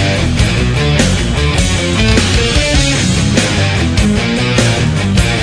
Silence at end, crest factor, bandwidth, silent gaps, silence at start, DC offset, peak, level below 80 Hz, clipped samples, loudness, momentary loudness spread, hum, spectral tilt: 0 s; 12 dB; 11 kHz; none; 0 s; under 0.1%; 0 dBFS; -18 dBFS; under 0.1%; -12 LUFS; 2 LU; none; -4.5 dB/octave